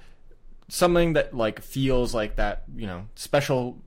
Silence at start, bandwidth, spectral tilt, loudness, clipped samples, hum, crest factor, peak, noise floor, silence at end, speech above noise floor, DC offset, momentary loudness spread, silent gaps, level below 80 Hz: 0.25 s; 16.5 kHz; -5.5 dB/octave; -25 LUFS; under 0.1%; none; 16 dB; -10 dBFS; -45 dBFS; 0.05 s; 21 dB; under 0.1%; 14 LU; none; -34 dBFS